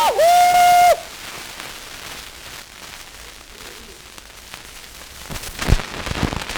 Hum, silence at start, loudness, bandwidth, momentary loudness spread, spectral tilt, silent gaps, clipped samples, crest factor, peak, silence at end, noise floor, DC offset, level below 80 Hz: none; 0 s; -16 LUFS; over 20 kHz; 25 LU; -3.5 dB/octave; none; under 0.1%; 18 dB; -2 dBFS; 0 s; -40 dBFS; under 0.1%; -34 dBFS